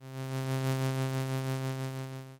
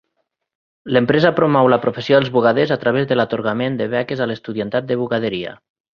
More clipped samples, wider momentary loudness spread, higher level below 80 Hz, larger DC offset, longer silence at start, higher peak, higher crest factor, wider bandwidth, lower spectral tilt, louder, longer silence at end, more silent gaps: neither; about the same, 7 LU vs 9 LU; second, -70 dBFS vs -56 dBFS; neither; second, 0 s vs 0.85 s; second, -22 dBFS vs -2 dBFS; about the same, 12 dB vs 16 dB; first, 17 kHz vs 6.8 kHz; second, -6 dB/octave vs -8 dB/octave; second, -34 LUFS vs -17 LUFS; second, 0 s vs 0.4 s; neither